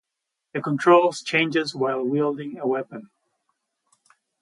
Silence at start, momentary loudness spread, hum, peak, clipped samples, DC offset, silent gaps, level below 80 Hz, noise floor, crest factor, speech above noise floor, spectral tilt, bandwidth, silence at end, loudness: 0.55 s; 15 LU; none; -4 dBFS; under 0.1%; under 0.1%; none; -74 dBFS; -83 dBFS; 20 dB; 61 dB; -5.5 dB/octave; 11.5 kHz; 1.35 s; -22 LUFS